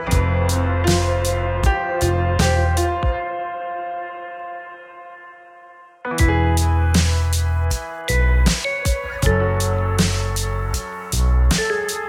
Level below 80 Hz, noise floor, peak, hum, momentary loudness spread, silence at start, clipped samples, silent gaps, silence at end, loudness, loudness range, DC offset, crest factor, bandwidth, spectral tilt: -24 dBFS; -44 dBFS; -2 dBFS; none; 14 LU; 0 s; under 0.1%; none; 0 s; -20 LUFS; 6 LU; under 0.1%; 16 dB; 16 kHz; -5 dB/octave